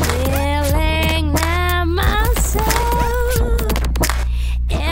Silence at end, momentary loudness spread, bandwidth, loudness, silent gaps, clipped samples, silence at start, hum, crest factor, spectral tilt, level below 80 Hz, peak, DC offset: 0 s; 3 LU; 16.5 kHz; -18 LUFS; none; under 0.1%; 0 s; none; 16 dB; -4.5 dB/octave; -18 dBFS; -2 dBFS; under 0.1%